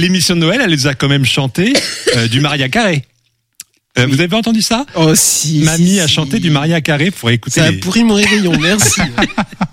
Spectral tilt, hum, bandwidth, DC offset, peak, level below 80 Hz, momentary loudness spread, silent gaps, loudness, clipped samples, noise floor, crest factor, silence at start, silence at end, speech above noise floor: -4 dB/octave; none; 16.5 kHz; under 0.1%; 0 dBFS; -38 dBFS; 5 LU; none; -11 LUFS; under 0.1%; -40 dBFS; 12 dB; 0 s; 0.05 s; 28 dB